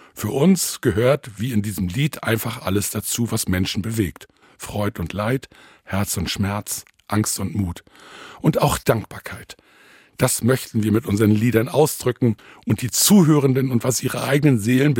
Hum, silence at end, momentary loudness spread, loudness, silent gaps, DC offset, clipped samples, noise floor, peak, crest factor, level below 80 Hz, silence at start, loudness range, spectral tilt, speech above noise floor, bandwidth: none; 0 s; 11 LU; -20 LUFS; none; under 0.1%; under 0.1%; -51 dBFS; -2 dBFS; 20 dB; -48 dBFS; 0.15 s; 7 LU; -5 dB/octave; 31 dB; 17 kHz